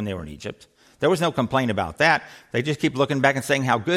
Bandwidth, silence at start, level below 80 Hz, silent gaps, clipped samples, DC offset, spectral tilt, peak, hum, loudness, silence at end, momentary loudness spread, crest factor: 16 kHz; 0 s; -54 dBFS; none; under 0.1%; under 0.1%; -5 dB/octave; -4 dBFS; none; -22 LUFS; 0 s; 12 LU; 18 dB